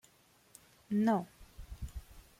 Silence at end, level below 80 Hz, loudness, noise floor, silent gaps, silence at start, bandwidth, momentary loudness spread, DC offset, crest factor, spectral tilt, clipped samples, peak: 0.2 s; -52 dBFS; -34 LUFS; -67 dBFS; none; 0.9 s; 16 kHz; 22 LU; under 0.1%; 18 dB; -7 dB/octave; under 0.1%; -20 dBFS